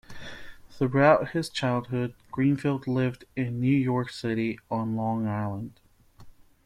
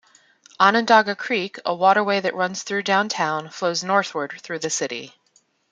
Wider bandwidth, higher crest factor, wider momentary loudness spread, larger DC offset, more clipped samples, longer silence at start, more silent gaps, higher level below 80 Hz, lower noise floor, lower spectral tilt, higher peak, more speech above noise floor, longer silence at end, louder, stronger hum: first, 13 kHz vs 9.6 kHz; about the same, 20 dB vs 20 dB; first, 14 LU vs 11 LU; neither; neither; second, 0.1 s vs 0.6 s; neither; first, -58 dBFS vs -72 dBFS; second, -50 dBFS vs -62 dBFS; first, -7.5 dB/octave vs -3 dB/octave; second, -8 dBFS vs -2 dBFS; second, 24 dB vs 41 dB; second, 0.35 s vs 0.6 s; second, -27 LUFS vs -21 LUFS; neither